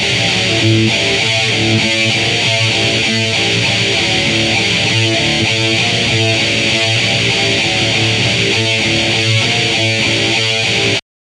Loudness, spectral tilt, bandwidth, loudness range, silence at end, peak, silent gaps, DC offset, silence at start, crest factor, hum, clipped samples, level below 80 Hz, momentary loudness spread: -11 LUFS; -3 dB/octave; 12 kHz; 0 LU; 0.35 s; 0 dBFS; none; under 0.1%; 0 s; 12 dB; none; under 0.1%; -40 dBFS; 1 LU